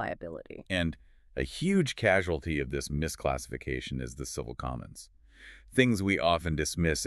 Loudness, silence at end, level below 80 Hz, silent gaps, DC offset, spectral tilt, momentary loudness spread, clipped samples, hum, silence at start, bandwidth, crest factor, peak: -30 LUFS; 0 s; -44 dBFS; none; under 0.1%; -5 dB/octave; 16 LU; under 0.1%; none; 0 s; 13.5 kHz; 22 dB; -8 dBFS